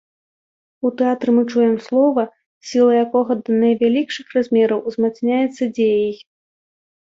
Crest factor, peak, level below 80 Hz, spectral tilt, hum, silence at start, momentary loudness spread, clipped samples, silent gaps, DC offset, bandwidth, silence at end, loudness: 14 dB; -4 dBFS; -66 dBFS; -6 dB/octave; none; 0.85 s; 8 LU; under 0.1%; 2.46-2.61 s; under 0.1%; 7.6 kHz; 0.95 s; -18 LUFS